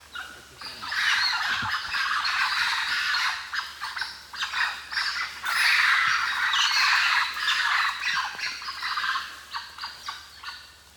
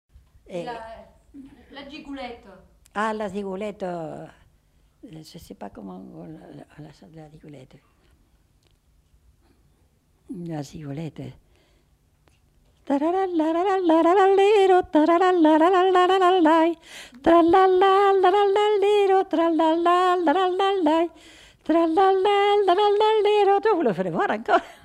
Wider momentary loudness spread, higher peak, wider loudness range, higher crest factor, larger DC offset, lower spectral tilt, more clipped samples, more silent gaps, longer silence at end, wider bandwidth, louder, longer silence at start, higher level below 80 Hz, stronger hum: second, 18 LU vs 22 LU; about the same, -8 dBFS vs -8 dBFS; second, 5 LU vs 20 LU; about the same, 18 dB vs 14 dB; neither; second, 1.5 dB/octave vs -5.5 dB/octave; neither; neither; about the same, 0.25 s vs 0.15 s; first, 19 kHz vs 11 kHz; second, -24 LUFS vs -20 LUFS; second, 0 s vs 0.5 s; about the same, -62 dBFS vs -58 dBFS; neither